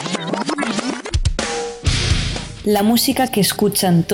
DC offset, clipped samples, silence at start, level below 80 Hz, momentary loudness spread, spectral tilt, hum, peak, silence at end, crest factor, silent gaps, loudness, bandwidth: under 0.1%; under 0.1%; 0 s; -28 dBFS; 8 LU; -4.5 dB/octave; none; -6 dBFS; 0 s; 12 dB; none; -18 LUFS; 17.5 kHz